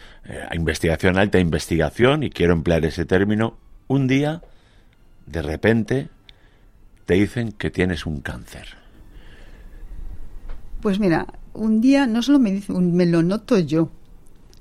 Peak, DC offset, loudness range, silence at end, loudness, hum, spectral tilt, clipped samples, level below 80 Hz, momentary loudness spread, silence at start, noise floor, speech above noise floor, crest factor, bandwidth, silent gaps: -2 dBFS; under 0.1%; 8 LU; 0.3 s; -20 LUFS; none; -6.5 dB/octave; under 0.1%; -38 dBFS; 18 LU; 0 s; -51 dBFS; 32 dB; 18 dB; 14.5 kHz; none